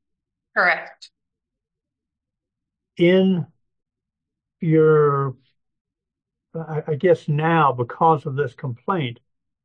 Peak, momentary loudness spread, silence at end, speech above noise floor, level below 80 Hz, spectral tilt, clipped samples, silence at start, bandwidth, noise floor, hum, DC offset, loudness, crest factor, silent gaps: -4 dBFS; 14 LU; 0.5 s; 66 dB; -70 dBFS; -8.5 dB/octave; under 0.1%; 0.55 s; 7.4 kHz; -85 dBFS; none; under 0.1%; -20 LUFS; 18 dB; 5.81-5.85 s